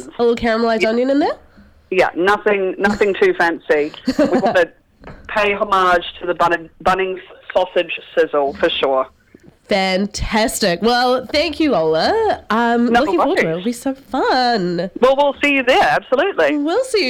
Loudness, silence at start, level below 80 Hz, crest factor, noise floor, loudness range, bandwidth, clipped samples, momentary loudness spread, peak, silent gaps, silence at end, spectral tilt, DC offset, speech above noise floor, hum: -16 LUFS; 0 s; -42 dBFS; 16 dB; -47 dBFS; 3 LU; 17 kHz; under 0.1%; 6 LU; -2 dBFS; none; 0 s; -4.5 dB/octave; under 0.1%; 31 dB; none